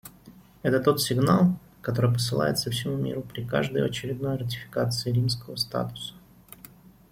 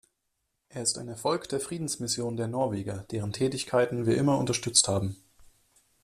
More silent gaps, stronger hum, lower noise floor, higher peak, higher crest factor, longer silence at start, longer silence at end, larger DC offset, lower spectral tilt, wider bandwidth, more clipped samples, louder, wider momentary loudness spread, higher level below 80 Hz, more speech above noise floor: neither; neither; second, -52 dBFS vs -79 dBFS; about the same, -8 dBFS vs -6 dBFS; about the same, 20 dB vs 24 dB; second, 0.05 s vs 0.75 s; first, 0.95 s vs 0.6 s; neither; first, -5.5 dB/octave vs -4 dB/octave; first, 16.5 kHz vs 14.5 kHz; neither; about the same, -26 LUFS vs -28 LUFS; about the same, 12 LU vs 12 LU; first, -56 dBFS vs -62 dBFS; second, 26 dB vs 51 dB